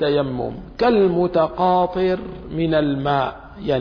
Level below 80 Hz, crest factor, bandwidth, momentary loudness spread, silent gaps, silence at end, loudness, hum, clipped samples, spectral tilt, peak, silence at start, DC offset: -42 dBFS; 14 dB; 5.4 kHz; 10 LU; none; 0 s; -20 LUFS; none; under 0.1%; -9 dB/octave; -6 dBFS; 0 s; under 0.1%